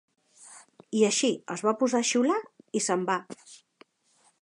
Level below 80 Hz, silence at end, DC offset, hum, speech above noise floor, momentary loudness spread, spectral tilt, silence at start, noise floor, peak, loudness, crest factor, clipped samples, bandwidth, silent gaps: -82 dBFS; 0.85 s; under 0.1%; none; 40 dB; 22 LU; -3 dB/octave; 0.4 s; -67 dBFS; -10 dBFS; -27 LUFS; 18 dB; under 0.1%; 11 kHz; none